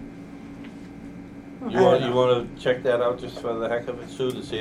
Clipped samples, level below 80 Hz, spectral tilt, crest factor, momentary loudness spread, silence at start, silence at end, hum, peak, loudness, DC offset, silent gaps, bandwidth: under 0.1%; -52 dBFS; -6.5 dB/octave; 20 dB; 21 LU; 0 s; 0 s; none; -6 dBFS; -24 LUFS; under 0.1%; none; 12.5 kHz